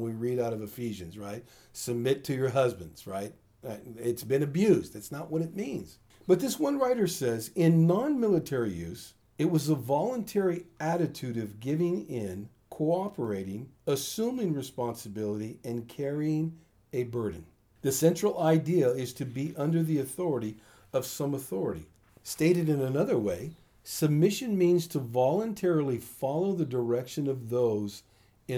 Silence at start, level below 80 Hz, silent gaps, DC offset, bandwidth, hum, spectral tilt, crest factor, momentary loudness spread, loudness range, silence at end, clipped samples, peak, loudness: 0 s; -66 dBFS; none; under 0.1%; over 20 kHz; none; -6.5 dB/octave; 18 dB; 15 LU; 5 LU; 0 s; under 0.1%; -10 dBFS; -30 LUFS